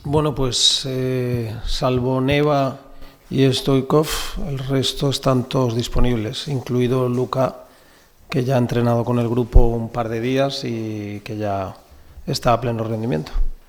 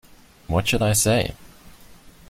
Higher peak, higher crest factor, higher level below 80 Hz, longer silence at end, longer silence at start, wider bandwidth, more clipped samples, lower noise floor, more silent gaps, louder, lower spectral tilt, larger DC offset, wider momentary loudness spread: first, 0 dBFS vs -6 dBFS; about the same, 20 dB vs 18 dB; first, -26 dBFS vs -42 dBFS; about the same, 0.1 s vs 0.2 s; second, 0 s vs 0.5 s; about the same, 17.5 kHz vs 16.5 kHz; neither; about the same, -50 dBFS vs -47 dBFS; neither; about the same, -20 LUFS vs -21 LUFS; first, -5.5 dB/octave vs -4 dB/octave; neither; about the same, 9 LU vs 8 LU